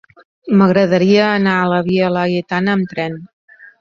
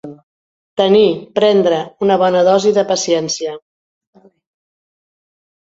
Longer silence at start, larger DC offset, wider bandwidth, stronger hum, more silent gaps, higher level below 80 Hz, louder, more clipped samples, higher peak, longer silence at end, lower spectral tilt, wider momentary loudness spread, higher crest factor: first, 0.45 s vs 0.05 s; neither; second, 7 kHz vs 7.8 kHz; neither; second, 3.33-3.48 s vs 0.23-0.76 s; first, -54 dBFS vs -60 dBFS; about the same, -15 LUFS vs -14 LUFS; neither; about the same, -2 dBFS vs 0 dBFS; second, 0.15 s vs 2.05 s; first, -7.5 dB/octave vs -4.5 dB/octave; about the same, 11 LU vs 10 LU; about the same, 14 dB vs 16 dB